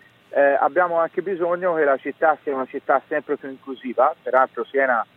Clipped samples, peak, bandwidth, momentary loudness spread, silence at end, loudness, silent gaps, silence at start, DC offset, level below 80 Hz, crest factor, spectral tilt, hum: under 0.1%; -4 dBFS; 4.1 kHz; 9 LU; 0.1 s; -21 LUFS; none; 0.3 s; under 0.1%; -76 dBFS; 18 dB; -7.5 dB/octave; none